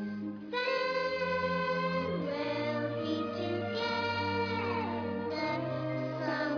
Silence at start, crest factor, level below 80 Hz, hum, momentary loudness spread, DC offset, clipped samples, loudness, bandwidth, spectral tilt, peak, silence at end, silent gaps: 0 s; 14 dB; -68 dBFS; none; 4 LU; under 0.1%; under 0.1%; -33 LUFS; 5.4 kHz; -6.5 dB/octave; -18 dBFS; 0 s; none